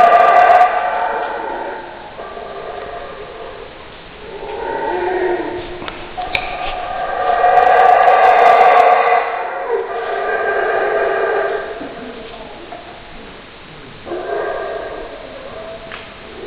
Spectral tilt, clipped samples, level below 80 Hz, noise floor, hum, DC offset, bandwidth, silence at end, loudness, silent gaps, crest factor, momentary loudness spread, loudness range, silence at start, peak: -5 dB/octave; under 0.1%; -42 dBFS; -36 dBFS; none; under 0.1%; 7 kHz; 0 s; -14 LUFS; none; 16 dB; 24 LU; 16 LU; 0 s; 0 dBFS